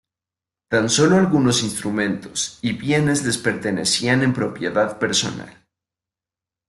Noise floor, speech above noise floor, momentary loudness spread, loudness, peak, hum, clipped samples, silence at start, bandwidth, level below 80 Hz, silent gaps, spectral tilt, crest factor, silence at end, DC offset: -89 dBFS; 70 dB; 8 LU; -19 LUFS; -4 dBFS; none; under 0.1%; 0.7 s; 12.5 kHz; -54 dBFS; none; -4 dB/octave; 16 dB; 1.2 s; under 0.1%